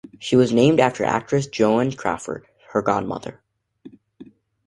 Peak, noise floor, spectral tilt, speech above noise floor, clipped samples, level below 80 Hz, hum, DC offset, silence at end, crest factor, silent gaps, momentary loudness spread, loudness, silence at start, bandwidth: -2 dBFS; -47 dBFS; -6 dB/octave; 28 dB; under 0.1%; -56 dBFS; none; under 0.1%; 0.45 s; 20 dB; none; 16 LU; -20 LUFS; 0.2 s; 11.5 kHz